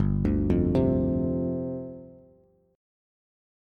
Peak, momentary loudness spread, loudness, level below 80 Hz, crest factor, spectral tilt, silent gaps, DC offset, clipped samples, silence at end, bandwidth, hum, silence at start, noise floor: -12 dBFS; 14 LU; -26 LUFS; -38 dBFS; 16 dB; -11 dB/octave; none; under 0.1%; under 0.1%; 1.6 s; 5.2 kHz; none; 0 s; -61 dBFS